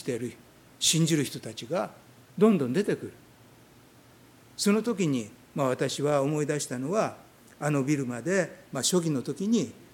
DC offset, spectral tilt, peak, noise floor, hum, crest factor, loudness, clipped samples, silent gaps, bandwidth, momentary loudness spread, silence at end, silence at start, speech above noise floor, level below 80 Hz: under 0.1%; -4.5 dB/octave; -8 dBFS; -55 dBFS; none; 20 dB; -28 LUFS; under 0.1%; none; 17.5 kHz; 11 LU; 0.1 s; 0 s; 28 dB; -70 dBFS